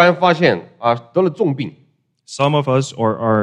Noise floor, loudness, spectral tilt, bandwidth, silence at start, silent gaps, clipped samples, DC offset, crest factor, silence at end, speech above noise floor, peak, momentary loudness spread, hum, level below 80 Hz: -52 dBFS; -17 LUFS; -6 dB/octave; 10.5 kHz; 0 s; none; under 0.1%; under 0.1%; 16 dB; 0 s; 36 dB; 0 dBFS; 8 LU; none; -62 dBFS